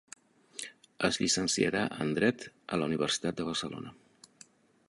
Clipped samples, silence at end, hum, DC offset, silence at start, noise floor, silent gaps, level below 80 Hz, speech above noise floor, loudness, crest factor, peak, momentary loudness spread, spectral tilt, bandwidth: under 0.1%; 0.95 s; none; under 0.1%; 0.55 s; -60 dBFS; none; -64 dBFS; 29 dB; -31 LUFS; 22 dB; -10 dBFS; 16 LU; -3.5 dB/octave; 11.5 kHz